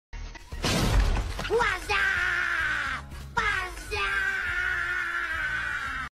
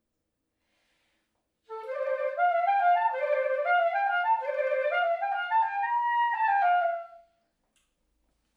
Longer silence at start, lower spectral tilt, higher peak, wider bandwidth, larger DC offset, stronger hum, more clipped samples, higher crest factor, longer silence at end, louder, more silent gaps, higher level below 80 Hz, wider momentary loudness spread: second, 0.15 s vs 1.7 s; first, -3.5 dB/octave vs -0.5 dB/octave; first, -12 dBFS vs -16 dBFS; first, 15 kHz vs 5.2 kHz; neither; neither; neither; about the same, 16 dB vs 14 dB; second, 0.05 s vs 1.4 s; about the same, -27 LUFS vs -27 LUFS; neither; first, -34 dBFS vs -84 dBFS; about the same, 7 LU vs 8 LU